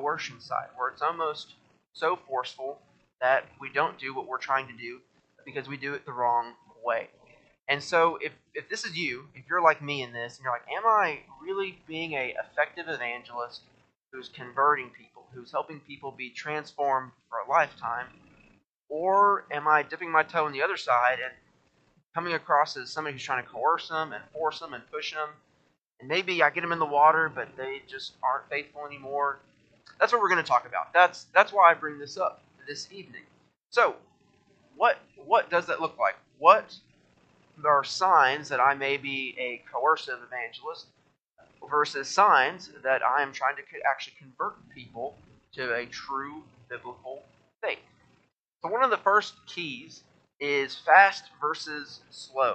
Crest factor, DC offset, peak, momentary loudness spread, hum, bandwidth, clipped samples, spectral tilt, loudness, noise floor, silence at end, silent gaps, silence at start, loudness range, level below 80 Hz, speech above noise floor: 24 dB; under 0.1%; -4 dBFS; 18 LU; none; 8.8 kHz; under 0.1%; -3.5 dB/octave; -27 LUFS; -69 dBFS; 0 s; 18.66-18.70 s, 18.76-18.81 s, 41.22-41.26 s, 48.40-48.52 s; 0 s; 8 LU; -76 dBFS; 42 dB